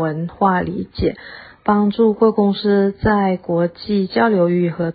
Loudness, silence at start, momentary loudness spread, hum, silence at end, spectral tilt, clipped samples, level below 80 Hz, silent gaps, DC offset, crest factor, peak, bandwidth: -17 LUFS; 0 s; 8 LU; none; 0 s; -12.5 dB/octave; under 0.1%; -40 dBFS; none; under 0.1%; 14 dB; -2 dBFS; 5 kHz